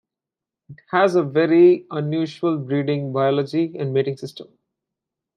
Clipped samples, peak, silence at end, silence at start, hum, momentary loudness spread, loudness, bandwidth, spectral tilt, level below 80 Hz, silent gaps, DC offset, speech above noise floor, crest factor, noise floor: under 0.1%; -4 dBFS; 0.95 s; 0.7 s; none; 10 LU; -20 LUFS; 9.6 kHz; -8 dB/octave; -72 dBFS; none; under 0.1%; 68 dB; 18 dB; -88 dBFS